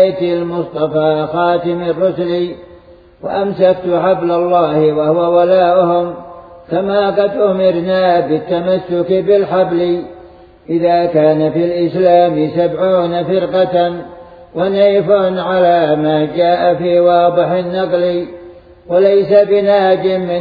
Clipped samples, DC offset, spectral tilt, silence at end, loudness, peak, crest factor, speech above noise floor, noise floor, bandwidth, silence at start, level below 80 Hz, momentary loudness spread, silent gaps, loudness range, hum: under 0.1%; under 0.1%; -9.5 dB/octave; 0 s; -13 LUFS; 0 dBFS; 12 dB; 29 dB; -41 dBFS; 5 kHz; 0 s; -50 dBFS; 8 LU; none; 3 LU; none